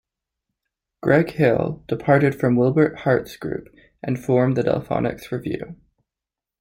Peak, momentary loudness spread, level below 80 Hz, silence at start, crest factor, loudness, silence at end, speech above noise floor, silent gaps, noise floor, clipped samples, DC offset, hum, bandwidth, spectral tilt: -2 dBFS; 13 LU; -52 dBFS; 1.05 s; 20 dB; -21 LUFS; 0.85 s; 68 dB; none; -88 dBFS; under 0.1%; under 0.1%; none; 16.5 kHz; -8.5 dB/octave